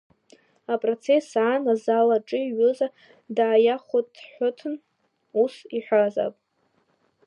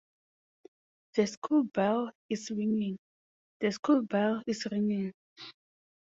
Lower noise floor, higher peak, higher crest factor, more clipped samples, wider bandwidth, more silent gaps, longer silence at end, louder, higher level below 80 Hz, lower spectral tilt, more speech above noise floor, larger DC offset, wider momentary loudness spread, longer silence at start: second, -69 dBFS vs under -90 dBFS; first, -8 dBFS vs -14 dBFS; about the same, 16 dB vs 18 dB; neither; first, 9.4 kHz vs 7.8 kHz; second, none vs 1.37-1.42 s, 2.15-2.29 s, 2.99-3.60 s, 3.79-3.83 s, 5.14-5.36 s; first, 0.95 s vs 0.6 s; first, -24 LUFS vs -31 LUFS; second, -82 dBFS vs -76 dBFS; about the same, -5.5 dB/octave vs -6 dB/octave; second, 46 dB vs over 60 dB; neither; second, 12 LU vs 16 LU; second, 0.7 s vs 1.15 s